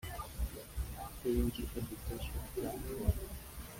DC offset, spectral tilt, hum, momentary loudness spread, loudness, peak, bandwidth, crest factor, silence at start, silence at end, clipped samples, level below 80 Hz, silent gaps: under 0.1%; -6 dB/octave; none; 9 LU; -40 LUFS; -18 dBFS; 16.5 kHz; 22 dB; 0 s; 0 s; under 0.1%; -44 dBFS; none